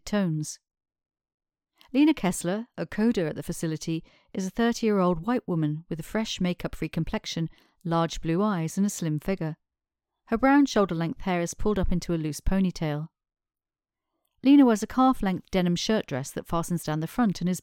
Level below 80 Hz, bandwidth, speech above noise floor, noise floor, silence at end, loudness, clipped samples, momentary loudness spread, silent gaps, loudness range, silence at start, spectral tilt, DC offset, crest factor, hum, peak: -42 dBFS; 17 kHz; over 65 dB; under -90 dBFS; 0 s; -26 LUFS; under 0.1%; 11 LU; 1.34-1.38 s; 5 LU; 0.05 s; -6 dB/octave; under 0.1%; 18 dB; none; -8 dBFS